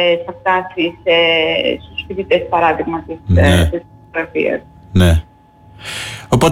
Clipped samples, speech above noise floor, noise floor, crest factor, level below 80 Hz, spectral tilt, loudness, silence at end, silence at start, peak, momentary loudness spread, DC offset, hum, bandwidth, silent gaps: under 0.1%; 29 dB; -44 dBFS; 12 dB; -30 dBFS; -5.5 dB/octave; -15 LUFS; 0 s; 0 s; -2 dBFS; 13 LU; under 0.1%; none; 15.5 kHz; none